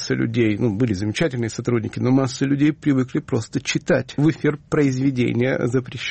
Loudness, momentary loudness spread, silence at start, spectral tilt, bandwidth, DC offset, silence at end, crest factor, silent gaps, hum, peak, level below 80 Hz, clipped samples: -21 LUFS; 5 LU; 0 s; -6.5 dB/octave; 8.8 kHz; under 0.1%; 0 s; 14 dB; none; none; -6 dBFS; -52 dBFS; under 0.1%